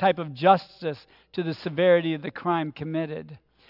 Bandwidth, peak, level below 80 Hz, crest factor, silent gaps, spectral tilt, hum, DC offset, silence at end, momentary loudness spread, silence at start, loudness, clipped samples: 5.8 kHz; -6 dBFS; -68 dBFS; 20 dB; none; -8.5 dB/octave; none; under 0.1%; 0.35 s; 13 LU; 0 s; -25 LUFS; under 0.1%